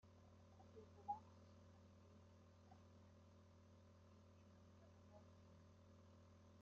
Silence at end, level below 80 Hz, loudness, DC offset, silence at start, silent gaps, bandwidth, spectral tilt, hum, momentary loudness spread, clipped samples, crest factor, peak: 0 s; -86 dBFS; -64 LUFS; under 0.1%; 0 s; none; 7.2 kHz; -6.5 dB/octave; none; 14 LU; under 0.1%; 26 dB; -38 dBFS